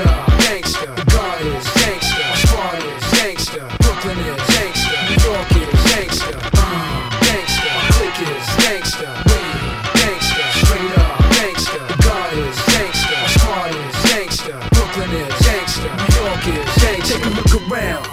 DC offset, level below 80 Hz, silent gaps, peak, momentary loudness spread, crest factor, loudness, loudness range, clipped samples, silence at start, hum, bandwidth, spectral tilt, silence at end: under 0.1%; -20 dBFS; none; 0 dBFS; 7 LU; 16 dB; -15 LUFS; 2 LU; under 0.1%; 0 s; none; 16.5 kHz; -4 dB/octave; 0 s